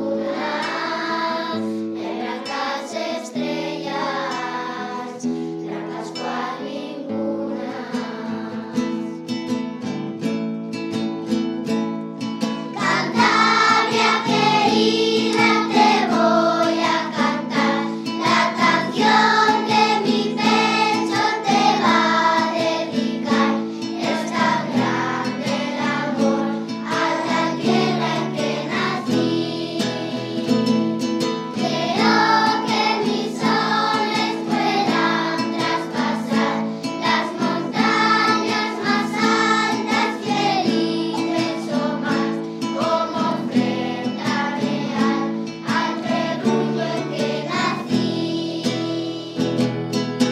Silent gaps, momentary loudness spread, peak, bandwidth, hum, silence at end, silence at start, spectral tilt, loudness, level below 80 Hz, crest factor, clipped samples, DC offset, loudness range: none; 10 LU; -2 dBFS; 13.5 kHz; none; 0 s; 0 s; -4.5 dB/octave; -20 LUFS; -72 dBFS; 18 dB; under 0.1%; under 0.1%; 9 LU